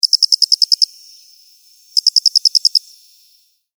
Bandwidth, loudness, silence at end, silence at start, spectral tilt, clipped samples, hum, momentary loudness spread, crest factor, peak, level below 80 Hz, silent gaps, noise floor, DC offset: over 20 kHz; -11 LUFS; 1 s; 0.05 s; 14 dB/octave; under 0.1%; none; 6 LU; 16 dB; 0 dBFS; under -90 dBFS; none; -55 dBFS; under 0.1%